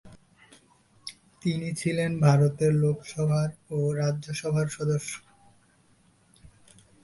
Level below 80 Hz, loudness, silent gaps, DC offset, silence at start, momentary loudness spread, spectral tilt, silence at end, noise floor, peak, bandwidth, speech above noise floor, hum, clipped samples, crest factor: -60 dBFS; -27 LUFS; none; under 0.1%; 0.05 s; 17 LU; -6.5 dB/octave; 0.55 s; -62 dBFS; -8 dBFS; 11.5 kHz; 37 dB; none; under 0.1%; 20 dB